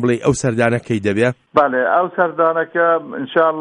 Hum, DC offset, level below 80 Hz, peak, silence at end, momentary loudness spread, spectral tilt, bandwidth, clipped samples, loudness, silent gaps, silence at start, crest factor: none; under 0.1%; -50 dBFS; -2 dBFS; 0 s; 4 LU; -6 dB/octave; 11 kHz; under 0.1%; -17 LUFS; none; 0 s; 16 dB